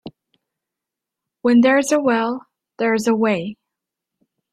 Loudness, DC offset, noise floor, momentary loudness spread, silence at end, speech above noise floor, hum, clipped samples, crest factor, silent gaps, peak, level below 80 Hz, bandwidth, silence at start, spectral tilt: -18 LUFS; under 0.1%; -85 dBFS; 11 LU; 1 s; 68 dB; none; under 0.1%; 16 dB; none; -4 dBFS; -64 dBFS; 13.5 kHz; 0.05 s; -4.5 dB/octave